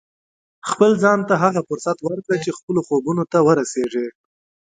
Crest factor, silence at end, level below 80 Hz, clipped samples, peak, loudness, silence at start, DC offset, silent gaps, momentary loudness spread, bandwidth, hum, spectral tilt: 18 dB; 0.6 s; -64 dBFS; under 0.1%; 0 dBFS; -19 LUFS; 0.65 s; under 0.1%; 2.63-2.68 s; 10 LU; 9.4 kHz; none; -6 dB/octave